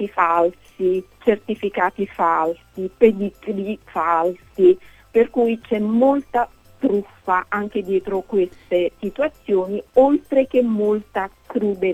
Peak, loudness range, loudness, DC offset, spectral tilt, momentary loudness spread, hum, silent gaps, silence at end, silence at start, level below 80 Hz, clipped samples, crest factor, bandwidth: -2 dBFS; 2 LU; -20 LUFS; under 0.1%; -7.5 dB/octave; 9 LU; none; none; 0 s; 0 s; -52 dBFS; under 0.1%; 18 dB; 13.5 kHz